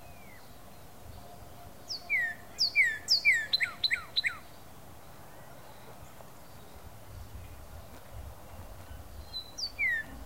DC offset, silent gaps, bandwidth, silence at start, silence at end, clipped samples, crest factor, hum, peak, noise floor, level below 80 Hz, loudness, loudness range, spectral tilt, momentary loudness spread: 0.3%; none; 16 kHz; 0 s; 0 s; under 0.1%; 20 dB; none; -14 dBFS; -52 dBFS; -54 dBFS; -28 LUFS; 22 LU; -1 dB/octave; 27 LU